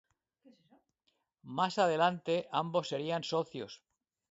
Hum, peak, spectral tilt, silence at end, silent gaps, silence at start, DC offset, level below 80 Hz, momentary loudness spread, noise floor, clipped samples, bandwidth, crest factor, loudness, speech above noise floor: none; -14 dBFS; -3.5 dB/octave; 0.55 s; none; 1.45 s; under 0.1%; -80 dBFS; 15 LU; -80 dBFS; under 0.1%; 7.6 kHz; 20 dB; -33 LUFS; 47 dB